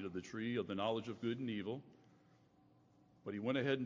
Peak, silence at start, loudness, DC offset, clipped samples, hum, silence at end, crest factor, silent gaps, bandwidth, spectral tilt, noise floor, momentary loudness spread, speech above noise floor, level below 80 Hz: -24 dBFS; 0 s; -42 LUFS; under 0.1%; under 0.1%; none; 0 s; 18 dB; none; 7.6 kHz; -6.5 dB/octave; -70 dBFS; 9 LU; 30 dB; -76 dBFS